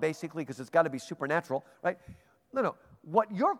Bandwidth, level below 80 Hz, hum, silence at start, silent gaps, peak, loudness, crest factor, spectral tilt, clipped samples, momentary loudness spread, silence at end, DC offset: 14.5 kHz; -70 dBFS; none; 0 s; none; -10 dBFS; -32 LUFS; 22 dB; -6 dB/octave; under 0.1%; 10 LU; 0 s; under 0.1%